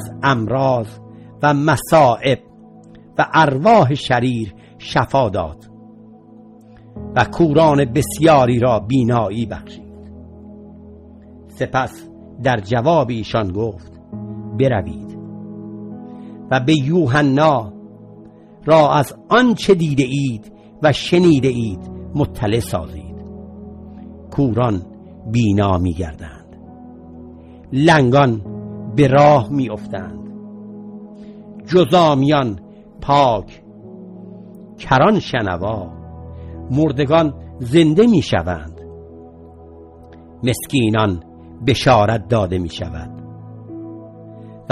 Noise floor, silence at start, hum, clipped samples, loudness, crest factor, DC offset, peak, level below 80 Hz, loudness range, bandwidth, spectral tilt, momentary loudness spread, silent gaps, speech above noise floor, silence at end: -43 dBFS; 0 s; none; under 0.1%; -16 LUFS; 18 dB; under 0.1%; 0 dBFS; -44 dBFS; 6 LU; 12.5 kHz; -6.5 dB/octave; 23 LU; none; 27 dB; 0.1 s